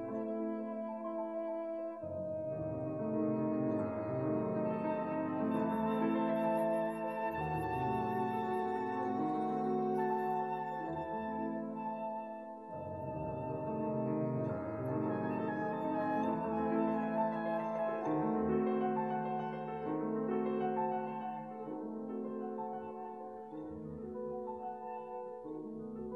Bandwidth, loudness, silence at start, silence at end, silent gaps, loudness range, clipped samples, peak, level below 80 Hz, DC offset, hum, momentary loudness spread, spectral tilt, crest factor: 12.5 kHz; -37 LUFS; 0 s; 0 s; none; 7 LU; under 0.1%; -22 dBFS; -66 dBFS; under 0.1%; none; 10 LU; -9 dB/octave; 16 dB